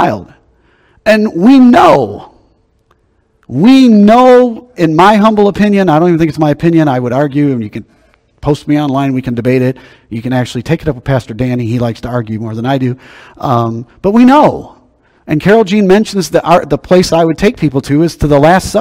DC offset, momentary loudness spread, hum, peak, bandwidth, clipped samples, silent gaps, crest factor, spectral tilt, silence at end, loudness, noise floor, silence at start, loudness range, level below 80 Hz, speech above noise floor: under 0.1%; 13 LU; none; 0 dBFS; 15 kHz; 3%; none; 10 dB; -7 dB/octave; 0 s; -9 LUFS; -55 dBFS; 0 s; 8 LU; -36 dBFS; 46 dB